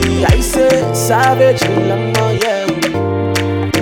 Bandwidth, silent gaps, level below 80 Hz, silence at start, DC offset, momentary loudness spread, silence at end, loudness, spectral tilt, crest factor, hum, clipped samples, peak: 19.5 kHz; none; -26 dBFS; 0 s; under 0.1%; 5 LU; 0 s; -13 LUFS; -5 dB/octave; 12 dB; none; under 0.1%; 0 dBFS